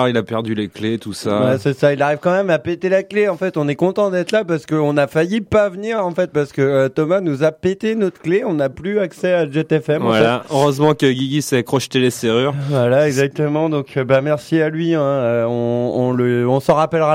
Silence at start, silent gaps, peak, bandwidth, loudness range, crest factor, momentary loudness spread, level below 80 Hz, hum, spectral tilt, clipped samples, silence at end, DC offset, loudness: 0 s; none; -2 dBFS; 16 kHz; 2 LU; 14 dB; 5 LU; -54 dBFS; none; -6 dB/octave; under 0.1%; 0 s; under 0.1%; -17 LUFS